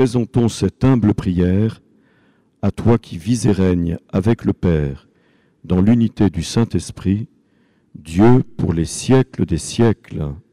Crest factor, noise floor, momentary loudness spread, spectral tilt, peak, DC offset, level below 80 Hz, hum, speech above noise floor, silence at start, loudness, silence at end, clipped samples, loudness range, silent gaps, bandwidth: 12 dB; -58 dBFS; 9 LU; -7 dB/octave; -6 dBFS; under 0.1%; -40 dBFS; none; 42 dB; 0 s; -18 LUFS; 0.1 s; under 0.1%; 2 LU; none; 12.5 kHz